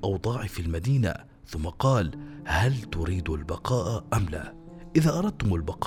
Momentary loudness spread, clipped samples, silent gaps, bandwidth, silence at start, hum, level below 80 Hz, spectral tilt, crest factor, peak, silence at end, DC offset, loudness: 12 LU; under 0.1%; none; 16 kHz; 0 s; none; -40 dBFS; -6.5 dB/octave; 18 dB; -8 dBFS; 0 s; under 0.1%; -28 LUFS